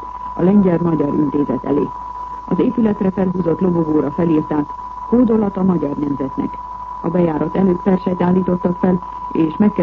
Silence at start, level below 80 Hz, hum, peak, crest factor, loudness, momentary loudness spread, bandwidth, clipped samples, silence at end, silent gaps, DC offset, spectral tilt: 0 s; -42 dBFS; none; -4 dBFS; 12 dB; -17 LUFS; 10 LU; 4.5 kHz; under 0.1%; 0 s; none; under 0.1%; -10.5 dB/octave